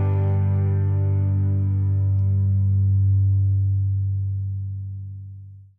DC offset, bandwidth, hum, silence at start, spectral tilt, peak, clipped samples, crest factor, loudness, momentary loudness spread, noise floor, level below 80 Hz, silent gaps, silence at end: under 0.1%; 2.3 kHz; none; 0 s; -13 dB/octave; -14 dBFS; under 0.1%; 8 dB; -22 LUFS; 14 LU; -40 dBFS; -60 dBFS; none; 0.15 s